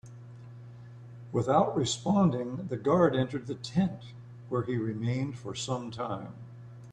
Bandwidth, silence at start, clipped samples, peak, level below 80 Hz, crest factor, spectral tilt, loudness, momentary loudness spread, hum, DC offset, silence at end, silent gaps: 9.8 kHz; 0.05 s; under 0.1%; -10 dBFS; -62 dBFS; 20 dB; -6 dB/octave; -30 LUFS; 22 LU; none; under 0.1%; 0 s; none